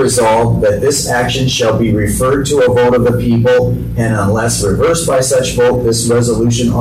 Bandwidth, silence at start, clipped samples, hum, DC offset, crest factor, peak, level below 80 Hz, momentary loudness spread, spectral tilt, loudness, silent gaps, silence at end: 15.5 kHz; 0 s; under 0.1%; none; under 0.1%; 8 dB; -4 dBFS; -28 dBFS; 3 LU; -5 dB/octave; -12 LUFS; none; 0 s